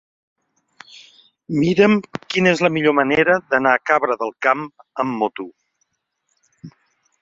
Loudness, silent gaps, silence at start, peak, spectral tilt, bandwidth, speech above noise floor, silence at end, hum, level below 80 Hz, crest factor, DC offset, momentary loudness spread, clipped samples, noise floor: -18 LUFS; none; 1.5 s; -2 dBFS; -6 dB/octave; 7.8 kHz; 54 dB; 0.5 s; none; -60 dBFS; 18 dB; under 0.1%; 10 LU; under 0.1%; -72 dBFS